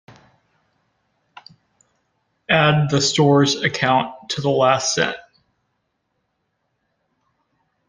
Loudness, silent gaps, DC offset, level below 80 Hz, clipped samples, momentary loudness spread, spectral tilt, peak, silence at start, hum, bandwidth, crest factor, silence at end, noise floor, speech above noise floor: -17 LUFS; none; under 0.1%; -58 dBFS; under 0.1%; 9 LU; -4.5 dB/octave; 0 dBFS; 2.5 s; none; 10 kHz; 22 dB; 2.7 s; -72 dBFS; 55 dB